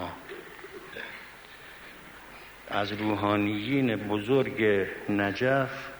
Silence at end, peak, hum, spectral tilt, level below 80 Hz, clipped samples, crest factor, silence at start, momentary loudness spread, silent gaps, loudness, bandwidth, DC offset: 0 s; -12 dBFS; none; -6.5 dB/octave; -60 dBFS; under 0.1%; 18 dB; 0 s; 20 LU; none; -28 LUFS; over 20 kHz; under 0.1%